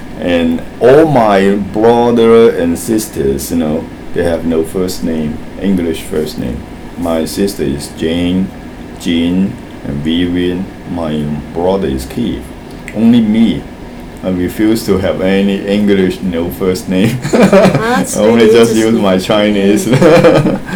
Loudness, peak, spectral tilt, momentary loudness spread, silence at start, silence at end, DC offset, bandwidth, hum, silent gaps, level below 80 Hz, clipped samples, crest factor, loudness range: -11 LUFS; 0 dBFS; -6 dB/octave; 14 LU; 0 s; 0 s; under 0.1%; over 20 kHz; none; none; -32 dBFS; 0.7%; 12 dB; 7 LU